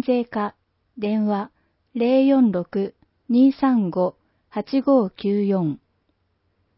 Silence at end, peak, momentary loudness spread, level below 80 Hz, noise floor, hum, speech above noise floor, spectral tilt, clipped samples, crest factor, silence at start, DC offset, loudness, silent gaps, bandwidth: 1 s; -6 dBFS; 14 LU; -64 dBFS; -69 dBFS; none; 49 dB; -12 dB/octave; under 0.1%; 14 dB; 0.05 s; under 0.1%; -21 LUFS; none; 5.8 kHz